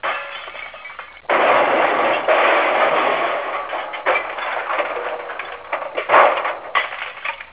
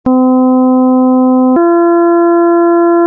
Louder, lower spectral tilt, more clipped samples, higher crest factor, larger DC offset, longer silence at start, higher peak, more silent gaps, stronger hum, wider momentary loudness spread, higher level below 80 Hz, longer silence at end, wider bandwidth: second, -18 LUFS vs -8 LUFS; second, -6 dB/octave vs -12 dB/octave; neither; first, 20 dB vs 4 dB; first, 0.2% vs under 0.1%; about the same, 0.05 s vs 0.05 s; first, 0 dBFS vs -4 dBFS; neither; neither; first, 15 LU vs 0 LU; second, -62 dBFS vs -52 dBFS; about the same, 0 s vs 0 s; first, 4 kHz vs 1.8 kHz